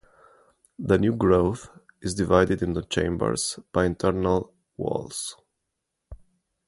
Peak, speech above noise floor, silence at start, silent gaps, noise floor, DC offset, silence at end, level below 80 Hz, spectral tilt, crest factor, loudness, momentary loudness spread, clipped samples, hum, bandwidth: -4 dBFS; 57 dB; 0.8 s; none; -81 dBFS; under 0.1%; 0.5 s; -44 dBFS; -5.5 dB/octave; 22 dB; -25 LUFS; 13 LU; under 0.1%; none; 11.5 kHz